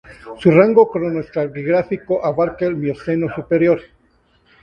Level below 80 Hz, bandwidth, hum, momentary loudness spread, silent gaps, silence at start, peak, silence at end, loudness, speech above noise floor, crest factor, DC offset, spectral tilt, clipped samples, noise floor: -52 dBFS; 9 kHz; none; 10 LU; none; 0.1 s; 0 dBFS; 0.8 s; -17 LUFS; 41 dB; 18 dB; under 0.1%; -9.5 dB/octave; under 0.1%; -58 dBFS